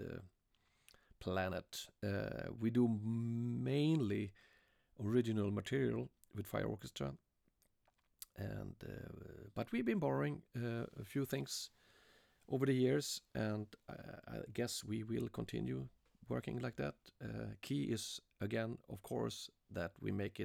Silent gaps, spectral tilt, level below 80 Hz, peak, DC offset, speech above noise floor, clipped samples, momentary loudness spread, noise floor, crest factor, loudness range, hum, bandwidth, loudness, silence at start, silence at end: none; -6 dB/octave; -68 dBFS; -22 dBFS; under 0.1%; 38 dB; under 0.1%; 14 LU; -79 dBFS; 18 dB; 6 LU; none; 19 kHz; -41 LUFS; 0 s; 0 s